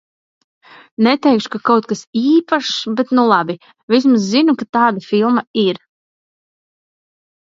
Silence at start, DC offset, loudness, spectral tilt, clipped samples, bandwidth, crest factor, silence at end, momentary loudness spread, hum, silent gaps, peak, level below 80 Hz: 1 s; under 0.1%; -15 LUFS; -5 dB/octave; under 0.1%; 7.8 kHz; 16 dB; 1.7 s; 6 LU; none; 2.07-2.13 s, 3.83-3.88 s, 4.69-4.73 s, 5.47-5.54 s; 0 dBFS; -66 dBFS